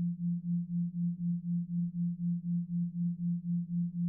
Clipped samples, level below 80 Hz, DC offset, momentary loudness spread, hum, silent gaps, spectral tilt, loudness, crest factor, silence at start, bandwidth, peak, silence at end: under 0.1%; -72 dBFS; under 0.1%; 2 LU; none; none; -18.5 dB/octave; -35 LUFS; 6 dB; 0 s; 0.4 kHz; -26 dBFS; 0 s